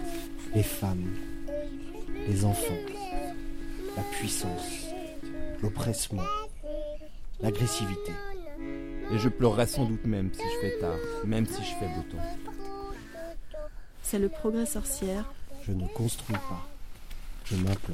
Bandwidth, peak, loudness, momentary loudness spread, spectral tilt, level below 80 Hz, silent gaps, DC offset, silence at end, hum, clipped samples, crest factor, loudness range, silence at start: 16.5 kHz; -10 dBFS; -32 LUFS; 13 LU; -5.5 dB/octave; -40 dBFS; none; under 0.1%; 0 s; none; under 0.1%; 22 dB; 5 LU; 0 s